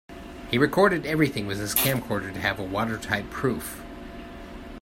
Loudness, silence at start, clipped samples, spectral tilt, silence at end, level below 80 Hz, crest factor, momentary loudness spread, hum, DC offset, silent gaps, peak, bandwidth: -25 LUFS; 0.1 s; under 0.1%; -4.5 dB/octave; 0 s; -46 dBFS; 24 dB; 19 LU; none; under 0.1%; none; -2 dBFS; 16.5 kHz